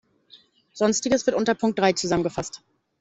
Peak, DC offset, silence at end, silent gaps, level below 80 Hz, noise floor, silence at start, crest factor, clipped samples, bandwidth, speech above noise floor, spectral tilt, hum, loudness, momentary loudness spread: -4 dBFS; under 0.1%; 0.45 s; none; -56 dBFS; -55 dBFS; 0.35 s; 20 dB; under 0.1%; 8.4 kHz; 32 dB; -4 dB/octave; none; -23 LUFS; 11 LU